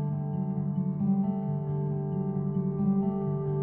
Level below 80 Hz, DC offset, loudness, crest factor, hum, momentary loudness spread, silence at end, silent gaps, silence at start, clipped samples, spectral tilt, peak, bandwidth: -62 dBFS; under 0.1%; -30 LUFS; 12 dB; none; 4 LU; 0 s; none; 0 s; under 0.1%; -13 dB/octave; -16 dBFS; 2.3 kHz